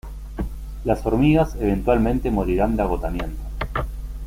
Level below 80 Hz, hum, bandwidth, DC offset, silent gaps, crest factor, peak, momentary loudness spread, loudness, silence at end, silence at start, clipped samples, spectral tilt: -28 dBFS; none; 16 kHz; under 0.1%; none; 18 dB; -4 dBFS; 14 LU; -22 LUFS; 0 s; 0.05 s; under 0.1%; -8 dB/octave